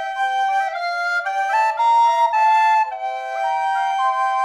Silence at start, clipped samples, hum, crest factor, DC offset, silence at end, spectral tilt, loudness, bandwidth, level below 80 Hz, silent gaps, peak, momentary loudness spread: 0 s; under 0.1%; none; 10 dB; under 0.1%; 0 s; 3 dB/octave; -18 LUFS; 12 kHz; -66 dBFS; none; -8 dBFS; 8 LU